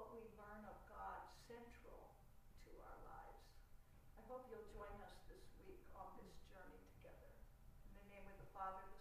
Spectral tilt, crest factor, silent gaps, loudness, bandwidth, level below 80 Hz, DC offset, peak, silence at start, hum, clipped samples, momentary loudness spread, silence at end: -5.5 dB/octave; 20 dB; none; -60 LUFS; 15.5 kHz; -66 dBFS; under 0.1%; -38 dBFS; 0 s; none; under 0.1%; 13 LU; 0 s